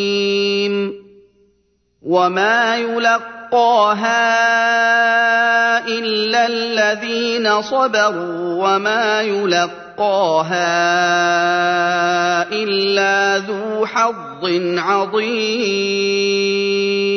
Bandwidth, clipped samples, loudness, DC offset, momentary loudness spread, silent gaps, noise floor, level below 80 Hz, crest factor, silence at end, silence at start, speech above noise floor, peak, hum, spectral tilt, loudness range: 6.6 kHz; under 0.1%; -16 LUFS; under 0.1%; 6 LU; none; -62 dBFS; -66 dBFS; 14 dB; 0 s; 0 s; 46 dB; -2 dBFS; none; -3.5 dB/octave; 3 LU